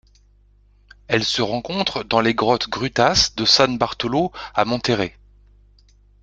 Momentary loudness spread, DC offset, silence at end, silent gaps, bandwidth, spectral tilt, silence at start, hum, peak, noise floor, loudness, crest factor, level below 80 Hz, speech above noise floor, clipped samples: 8 LU; under 0.1%; 1.15 s; none; 11 kHz; -3.5 dB/octave; 1.1 s; 50 Hz at -45 dBFS; 0 dBFS; -54 dBFS; -19 LUFS; 22 dB; -46 dBFS; 34 dB; under 0.1%